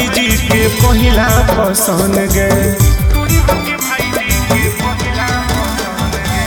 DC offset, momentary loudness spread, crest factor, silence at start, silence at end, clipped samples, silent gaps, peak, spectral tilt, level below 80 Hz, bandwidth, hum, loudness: under 0.1%; 5 LU; 12 dB; 0 s; 0 s; under 0.1%; none; 0 dBFS; -4.5 dB/octave; -18 dBFS; 19.5 kHz; none; -12 LUFS